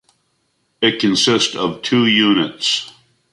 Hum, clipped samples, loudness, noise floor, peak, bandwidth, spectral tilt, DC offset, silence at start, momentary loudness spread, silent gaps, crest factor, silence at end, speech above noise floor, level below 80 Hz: none; under 0.1%; -15 LUFS; -66 dBFS; -2 dBFS; 11.5 kHz; -3.5 dB/octave; under 0.1%; 0.8 s; 7 LU; none; 16 dB; 0.45 s; 50 dB; -58 dBFS